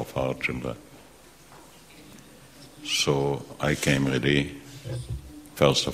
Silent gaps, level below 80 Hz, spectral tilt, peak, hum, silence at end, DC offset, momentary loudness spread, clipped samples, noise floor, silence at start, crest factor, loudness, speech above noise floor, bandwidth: none; -48 dBFS; -4.5 dB/octave; -4 dBFS; none; 0 s; under 0.1%; 20 LU; under 0.1%; -52 dBFS; 0 s; 24 dB; -26 LUFS; 26 dB; 16 kHz